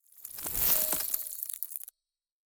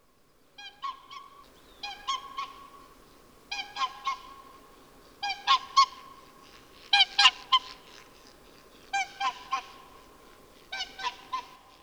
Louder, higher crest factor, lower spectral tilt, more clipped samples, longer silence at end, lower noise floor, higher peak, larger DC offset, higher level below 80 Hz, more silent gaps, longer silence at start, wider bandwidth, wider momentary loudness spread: about the same, -29 LUFS vs -28 LUFS; about the same, 28 dB vs 26 dB; first, -0.5 dB/octave vs 1.5 dB/octave; neither; first, 0.7 s vs 0.35 s; first, -90 dBFS vs -64 dBFS; about the same, -6 dBFS vs -6 dBFS; neither; first, -56 dBFS vs -64 dBFS; neither; second, 0.15 s vs 0.6 s; about the same, over 20 kHz vs over 20 kHz; second, 17 LU vs 25 LU